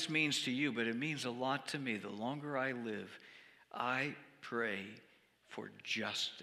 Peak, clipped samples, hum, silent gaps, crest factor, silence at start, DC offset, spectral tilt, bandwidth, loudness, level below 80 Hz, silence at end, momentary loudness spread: -20 dBFS; under 0.1%; none; none; 20 dB; 0 s; under 0.1%; -3.5 dB/octave; 15 kHz; -38 LUFS; -88 dBFS; 0 s; 17 LU